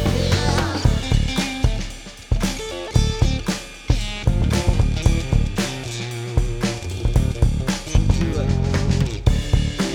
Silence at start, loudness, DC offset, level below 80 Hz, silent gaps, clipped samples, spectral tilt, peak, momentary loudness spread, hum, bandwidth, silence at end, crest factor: 0 s; -21 LUFS; under 0.1%; -24 dBFS; none; under 0.1%; -5.5 dB/octave; -2 dBFS; 7 LU; none; 15.5 kHz; 0 s; 16 dB